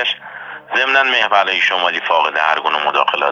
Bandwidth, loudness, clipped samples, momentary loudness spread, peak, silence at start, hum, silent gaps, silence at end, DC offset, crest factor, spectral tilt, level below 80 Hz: 7.6 kHz; -14 LUFS; under 0.1%; 8 LU; 0 dBFS; 0 s; none; none; 0 s; under 0.1%; 16 dB; -1.5 dB/octave; -74 dBFS